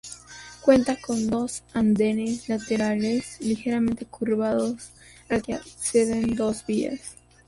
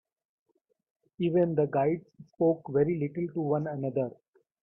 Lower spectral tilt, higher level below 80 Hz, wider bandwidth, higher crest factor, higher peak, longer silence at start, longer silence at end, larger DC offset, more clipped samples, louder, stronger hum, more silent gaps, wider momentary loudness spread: second, -5 dB/octave vs -11.5 dB/octave; first, -52 dBFS vs -68 dBFS; first, 11.5 kHz vs 3.8 kHz; about the same, 20 dB vs 16 dB; first, -6 dBFS vs -14 dBFS; second, 0.05 s vs 1.2 s; second, 0.35 s vs 0.5 s; neither; neither; first, -25 LUFS vs -29 LUFS; neither; neither; first, 13 LU vs 7 LU